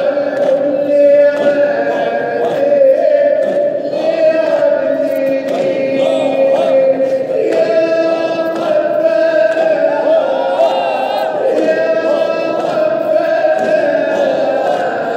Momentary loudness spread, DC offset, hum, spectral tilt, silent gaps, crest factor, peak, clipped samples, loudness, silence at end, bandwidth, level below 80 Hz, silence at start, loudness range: 5 LU; under 0.1%; none; -5.5 dB/octave; none; 12 dB; 0 dBFS; under 0.1%; -13 LUFS; 0 s; 9 kHz; -72 dBFS; 0 s; 2 LU